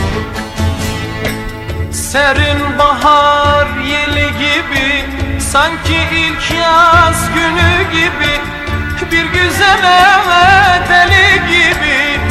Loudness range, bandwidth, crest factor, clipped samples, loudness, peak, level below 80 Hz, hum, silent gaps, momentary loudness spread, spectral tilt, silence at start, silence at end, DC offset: 4 LU; 16 kHz; 10 dB; 0.6%; -10 LUFS; 0 dBFS; -28 dBFS; none; none; 12 LU; -4 dB/octave; 0 s; 0 s; under 0.1%